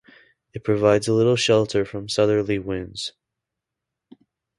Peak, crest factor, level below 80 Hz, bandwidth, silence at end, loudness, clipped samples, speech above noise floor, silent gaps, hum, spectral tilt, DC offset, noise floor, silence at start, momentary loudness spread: -4 dBFS; 20 dB; -52 dBFS; 11.5 kHz; 1.5 s; -21 LUFS; under 0.1%; 64 dB; none; none; -5 dB/octave; under 0.1%; -84 dBFS; 0.55 s; 13 LU